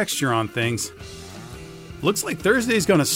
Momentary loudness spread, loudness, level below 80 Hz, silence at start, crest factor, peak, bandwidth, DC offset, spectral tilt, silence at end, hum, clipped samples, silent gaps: 20 LU; -22 LUFS; -50 dBFS; 0 s; 18 dB; -6 dBFS; 16 kHz; under 0.1%; -4 dB/octave; 0 s; none; under 0.1%; none